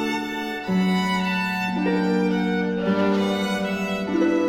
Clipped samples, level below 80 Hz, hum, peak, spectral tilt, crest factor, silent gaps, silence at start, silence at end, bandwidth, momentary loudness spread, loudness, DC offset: under 0.1%; -56 dBFS; none; -10 dBFS; -6 dB/octave; 12 dB; none; 0 s; 0 s; 15.5 kHz; 4 LU; -23 LUFS; under 0.1%